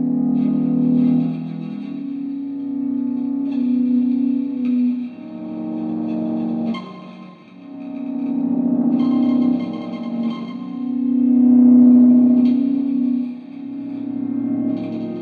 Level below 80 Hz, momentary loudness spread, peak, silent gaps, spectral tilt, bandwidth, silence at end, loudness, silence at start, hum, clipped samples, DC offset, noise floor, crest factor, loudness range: -70 dBFS; 16 LU; -4 dBFS; none; -10 dB/octave; 4.7 kHz; 0 s; -18 LUFS; 0 s; none; under 0.1%; under 0.1%; -39 dBFS; 14 dB; 9 LU